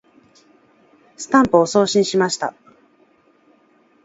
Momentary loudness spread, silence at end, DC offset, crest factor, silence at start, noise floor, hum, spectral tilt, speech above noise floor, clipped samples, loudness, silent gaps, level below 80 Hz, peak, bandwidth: 12 LU; 1.55 s; under 0.1%; 20 dB; 1.2 s; -56 dBFS; none; -4.5 dB/octave; 40 dB; under 0.1%; -17 LUFS; none; -58 dBFS; 0 dBFS; 8 kHz